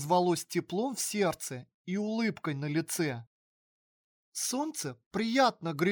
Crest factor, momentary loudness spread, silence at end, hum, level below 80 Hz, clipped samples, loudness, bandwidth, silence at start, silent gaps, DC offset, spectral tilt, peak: 18 dB; 11 LU; 0 s; none; -74 dBFS; under 0.1%; -32 LUFS; over 20 kHz; 0 s; 1.74-1.85 s, 3.27-4.32 s, 5.06-5.11 s; under 0.1%; -4.5 dB/octave; -14 dBFS